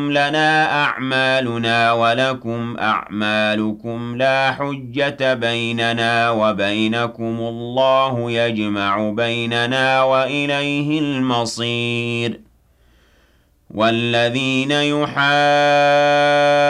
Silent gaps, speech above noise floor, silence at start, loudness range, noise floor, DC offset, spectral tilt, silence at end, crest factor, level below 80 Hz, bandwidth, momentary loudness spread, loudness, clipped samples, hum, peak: none; 39 dB; 0 s; 4 LU; -56 dBFS; under 0.1%; -5 dB/octave; 0 s; 12 dB; -56 dBFS; 12 kHz; 9 LU; -17 LUFS; under 0.1%; none; -6 dBFS